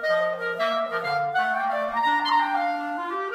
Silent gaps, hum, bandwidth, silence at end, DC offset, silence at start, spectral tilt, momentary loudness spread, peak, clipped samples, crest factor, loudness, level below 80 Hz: none; none; 15.5 kHz; 0 s; under 0.1%; 0 s; -4 dB/octave; 5 LU; -10 dBFS; under 0.1%; 14 dB; -24 LUFS; -68 dBFS